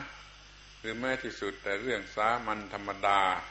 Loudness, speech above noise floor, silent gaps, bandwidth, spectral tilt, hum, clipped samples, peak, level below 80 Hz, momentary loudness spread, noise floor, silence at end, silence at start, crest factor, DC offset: -32 LUFS; 21 dB; none; 8.2 kHz; -4 dB/octave; 50 Hz at -55 dBFS; under 0.1%; -12 dBFS; -58 dBFS; 22 LU; -53 dBFS; 0 s; 0 s; 22 dB; under 0.1%